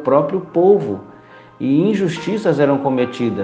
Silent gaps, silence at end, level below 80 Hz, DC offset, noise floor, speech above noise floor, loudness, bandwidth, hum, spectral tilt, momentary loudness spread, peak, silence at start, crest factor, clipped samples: none; 0 s; -62 dBFS; under 0.1%; -42 dBFS; 26 dB; -17 LUFS; 9 kHz; none; -7.5 dB/octave; 8 LU; 0 dBFS; 0 s; 16 dB; under 0.1%